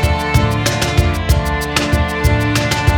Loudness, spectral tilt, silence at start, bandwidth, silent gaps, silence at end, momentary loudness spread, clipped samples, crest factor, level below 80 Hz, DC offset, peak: -15 LUFS; -5 dB/octave; 0 s; over 20 kHz; none; 0 s; 2 LU; under 0.1%; 14 dB; -20 dBFS; under 0.1%; 0 dBFS